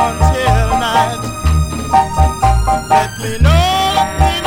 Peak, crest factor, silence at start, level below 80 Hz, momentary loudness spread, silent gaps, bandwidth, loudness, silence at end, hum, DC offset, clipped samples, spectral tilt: 0 dBFS; 12 dB; 0 s; -18 dBFS; 4 LU; none; 17 kHz; -13 LUFS; 0 s; none; under 0.1%; under 0.1%; -5 dB/octave